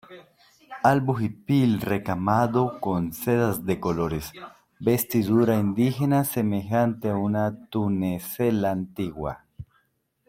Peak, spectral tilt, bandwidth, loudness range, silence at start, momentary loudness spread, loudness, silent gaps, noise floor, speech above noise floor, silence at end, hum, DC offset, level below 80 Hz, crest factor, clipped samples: -4 dBFS; -7 dB/octave; 16.5 kHz; 3 LU; 0.1 s; 9 LU; -25 LUFS; none; -70 dBFS; 46 dB; 0.65 s; none; under 0.1%; -54 dBFS; 20 dB; under 0.1%